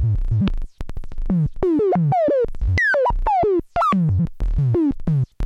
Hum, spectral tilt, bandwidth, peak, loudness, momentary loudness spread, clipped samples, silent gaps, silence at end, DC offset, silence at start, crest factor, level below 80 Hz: none; -9 dB/octave; 7.8 kHz; -6 dBFS; -20 LUFS; 7 LU; under 0.1%; none; 0 s; under 0.1%; 0 s; 12 dB; -26 dBFS